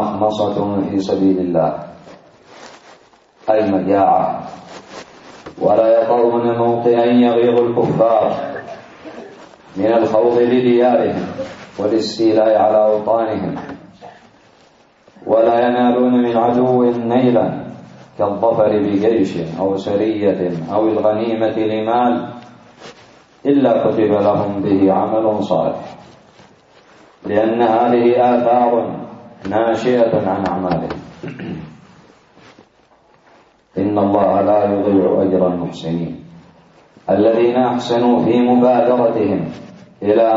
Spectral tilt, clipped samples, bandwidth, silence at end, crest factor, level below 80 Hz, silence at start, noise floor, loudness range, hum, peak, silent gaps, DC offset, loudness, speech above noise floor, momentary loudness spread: -7.5 dB/octave; under 0.1%; 7.8 kHz; 0 s; 14 dB; -56 dBFS; 0 s; -52 dBFS; 5 LU; none; -2 dBFS; none; under 0.1%; -15 LUFS; 38 dB; 17 LU